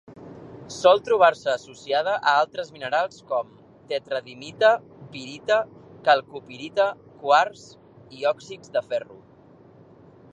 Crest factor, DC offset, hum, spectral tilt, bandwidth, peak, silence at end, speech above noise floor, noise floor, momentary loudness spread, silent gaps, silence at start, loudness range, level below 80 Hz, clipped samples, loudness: 22 dB; under 0.1%; none; -3.5 dB/octave; 10.5 kHz; -2 dBFS; 1.3 s; 28 dB; -51 dBFS; 20 LU; none; 0.1 s; 4 LU; -68 dBFS; under 0.1%; -23 LUFS